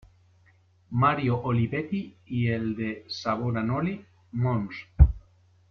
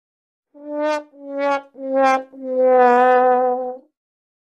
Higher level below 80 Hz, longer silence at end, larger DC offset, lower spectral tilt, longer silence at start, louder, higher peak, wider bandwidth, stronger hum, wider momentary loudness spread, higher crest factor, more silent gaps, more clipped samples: first, -34 dBFS vs -76 dBFS; second, 0.5 s vs 0.8 s; neither; first, -8 dB/octave vs -3.5 dB/octave; first, 0.9 s vs 0.6 s; second, -27 LUFS vs -18 LUFS; about the same, -4 dBFS vs -4 dBFS; second, 6.4 kHz vs 8.2 kHz; neither; second, 11 LU vs 16 LU; first, 24 dB vs 16 dB; neither; neither